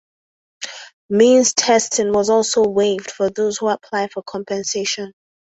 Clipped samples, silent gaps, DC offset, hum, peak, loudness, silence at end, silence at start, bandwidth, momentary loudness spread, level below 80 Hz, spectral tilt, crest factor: under 0.1%; 0.93-1.09 s; under 0.1%; none; -2 dBFS; -17 LUFS; 0.4 s; 0.6 s; 8.2 kHz; 18 LU; -60 dBFS; -3 dB/octave; 16 dB